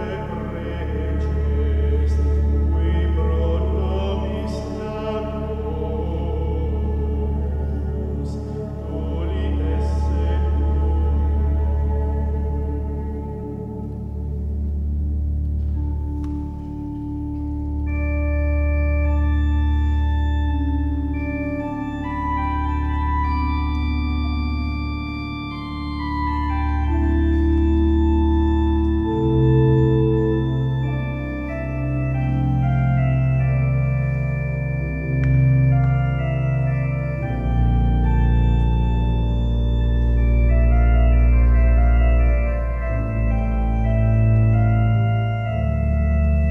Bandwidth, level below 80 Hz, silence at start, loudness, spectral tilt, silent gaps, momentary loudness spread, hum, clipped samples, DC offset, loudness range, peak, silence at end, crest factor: 5 kHz; -22 dBFS; 0 s; -21 LUFS; -9.5 dB/octave; none; 10 LU; none; under 0.1%; under 0.1%; 7 LU; -6 dBFS; 0 s; 14 dB